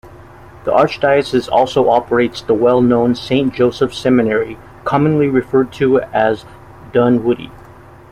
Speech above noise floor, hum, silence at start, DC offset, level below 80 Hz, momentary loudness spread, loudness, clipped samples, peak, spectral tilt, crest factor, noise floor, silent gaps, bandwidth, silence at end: 25 dB; none; 0.05 s; under 0.1%; -44 dBFS; 6 LU; -15 LUFS; under 0.1%; -2 dBFS; -7 dB/octave; 14 dB; -39 dBFS; none; 11.5 kHz; 0.6 s